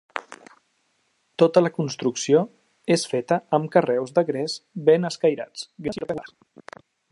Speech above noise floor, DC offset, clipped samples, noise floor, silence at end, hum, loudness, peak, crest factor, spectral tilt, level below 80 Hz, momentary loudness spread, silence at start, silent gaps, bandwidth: 47 dB; under 0.1%; under 0.1%; -69 dBFS; 0.85 s; none; -23 LUFS; -2 dBFS; 20 dB; -5.5 dB/octave; -66 dBFS; 14 LU; 0.15 s; none; 11.5 kHz